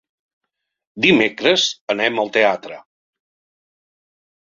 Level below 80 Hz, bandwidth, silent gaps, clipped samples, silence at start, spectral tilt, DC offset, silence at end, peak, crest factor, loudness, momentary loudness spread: -64 dBFS; 7.6 kHz; 1.81-1.87 s; under 0.1%; 0.95 s; -3.5 dB/octave; under 0.1%; 1.7 s; 0 dBFS; 20 dB; -16 LUFS; 6 LU